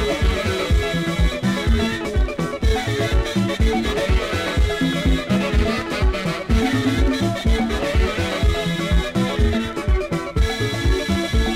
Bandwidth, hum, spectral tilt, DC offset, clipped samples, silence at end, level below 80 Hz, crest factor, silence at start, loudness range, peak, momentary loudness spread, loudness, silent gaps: 15 kHz; none; -5.5 dB/octave; under 0.1%; under 0.1%; 0 s; -22 dBFS; 14 dB; 0 s; 1 LU; -4 dBFS; 3 LU; -21 LUFS; none